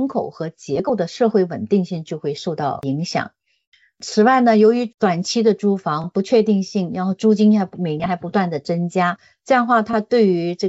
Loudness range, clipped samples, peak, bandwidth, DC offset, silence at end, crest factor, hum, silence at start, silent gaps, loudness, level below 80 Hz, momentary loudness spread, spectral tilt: 5 LU; under 0.1%; -4 dBFS; 8 kHz; under 0.1%; 0 s; 16 dB; none; 0 s; 3.67-3.72 s; -19 LUFS; -62 dBFS; 10 LU; -5.5 dB/octave